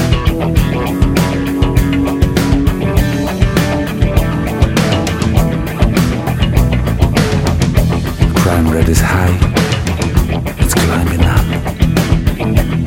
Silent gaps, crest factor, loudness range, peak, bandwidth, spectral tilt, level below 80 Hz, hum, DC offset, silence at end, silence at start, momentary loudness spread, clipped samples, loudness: none; 12 dB; 1 LU; 0 dBFS; 16.5 kHz; -6 dB/octave; -18 dBFS; none; under 0.1%; 0 s; 0 s; 3 LU; under 0.1%; -13 LUFS